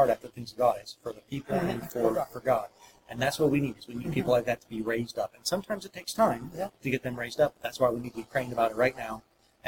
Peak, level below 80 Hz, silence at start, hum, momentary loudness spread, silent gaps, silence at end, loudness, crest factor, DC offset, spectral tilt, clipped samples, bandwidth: -10 dBFS; -60 dBFS; 0 s; none; 11 LU; none; 0 s; -30 LUFS; 18 dB; under 0.1%; -5.5 dB/octave; under 0.1%; 17 kHz